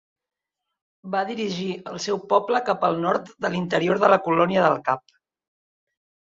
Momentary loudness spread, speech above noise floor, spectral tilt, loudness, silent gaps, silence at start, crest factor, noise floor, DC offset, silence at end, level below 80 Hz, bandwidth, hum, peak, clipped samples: 10 LU; 61 dB; -5.5 dB/octave; -23 LUFS; none; 1.05 s; 22 dB; -84 dBFS; under 0.1%; 1.4 s; -66 dBFS; 7.8 kHz; none; -2 dBFS; under 0.1%